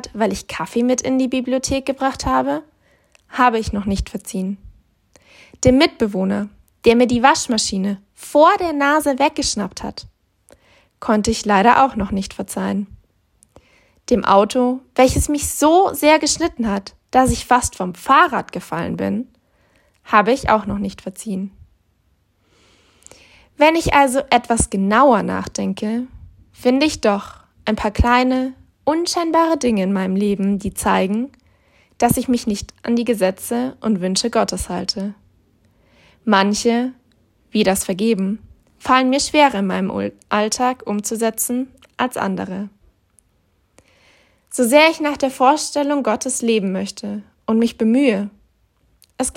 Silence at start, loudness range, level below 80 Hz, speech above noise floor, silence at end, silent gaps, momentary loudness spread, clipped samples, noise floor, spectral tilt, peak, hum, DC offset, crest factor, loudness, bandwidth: 0.05 s; 5 LU; -40 dBFS; 45 dB; 0.05 s; none; 13 LU; under 0.1%; -62 dBFS; -4.5 dB/octave; 0 dBFS; none; under 0.1%; 18 dB; -18 LUFS; 16.5 kHz